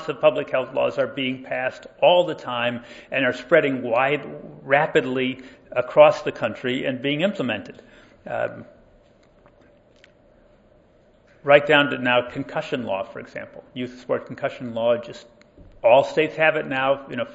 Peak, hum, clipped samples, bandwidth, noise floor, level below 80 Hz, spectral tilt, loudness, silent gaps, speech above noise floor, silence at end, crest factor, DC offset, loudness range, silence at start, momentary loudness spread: 0 dBFS; none; under 0.1%; 8 kHz; -56 dBFS; -60 dBFS; -6 dB/octave; -21 LUFS; none; 34 dB; 0 s; 22 dB; under 0.1%; 9 LU; 0 s; 16 LU